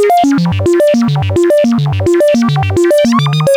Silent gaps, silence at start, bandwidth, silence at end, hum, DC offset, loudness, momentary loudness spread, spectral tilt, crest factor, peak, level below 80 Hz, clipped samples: none; 0 s; 18 kHz; 0 s; none; under 0.1%; -10 LUFS; 3 LU; -6.5 dB/octave; 10 dB; 0 dBFS; -42 dBFS; under 0.1%